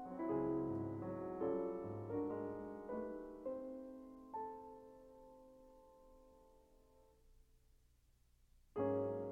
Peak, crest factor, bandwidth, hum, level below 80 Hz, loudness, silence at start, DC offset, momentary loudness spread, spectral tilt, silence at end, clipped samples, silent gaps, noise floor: -28 dBFS; 18 dB; 7.6 kHz; 60 Hz at -80 dBFS; -70 dBFS; -44 LUFS; 0 s; under 0.1%; 22 LU; -10 dB/octave; 0 s; under 0.1%; none; -73 dBFS